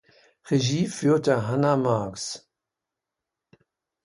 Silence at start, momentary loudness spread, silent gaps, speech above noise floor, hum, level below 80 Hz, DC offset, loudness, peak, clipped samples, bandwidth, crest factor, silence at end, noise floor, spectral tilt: 0.45 s; 11 LU; none; 63 dB; none; -62 dBFS; under 0.1%; -24 LUFS; -8 dBFS; under 0.1%; 11.5 kHz; 18 dB; 1.65 s; -87 dBFS; -6 dB/octave